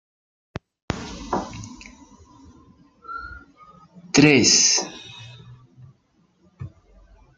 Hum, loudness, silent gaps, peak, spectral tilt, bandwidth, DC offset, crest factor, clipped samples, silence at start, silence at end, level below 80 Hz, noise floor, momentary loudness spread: none; -18 LUFS; none; -2 dBFS; -2.5 dB/octave; 10.5 kHz; under 0.1%; 24 dB; under 0.1%; 0.9 s; 0.7 s; -50 dBFS; -63 dBFS; 27 LU